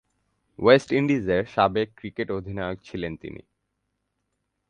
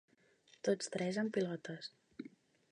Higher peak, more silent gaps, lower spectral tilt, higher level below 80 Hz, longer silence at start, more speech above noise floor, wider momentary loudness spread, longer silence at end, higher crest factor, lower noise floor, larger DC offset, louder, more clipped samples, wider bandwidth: first, -2 dBFS vs -22 dBFS; neither; first, -6.5 dB/octave vs -5 dB/octave; first, -52 dBFS vs -86 dBFS; about the same, 0.6 s vs 0.65 s; first, 54 dB vs 31 dB; about the same, 14 LU vs 16 LU; first, 1.3 s vs 0.45 s; about the same, 24 dB vs 20 dB; first, -78 dBFS vs -69 dBFS; neither; first, -24 LUFS vs -39 LUFS; neither; about the same, 9.6 kHz vs 10 kHz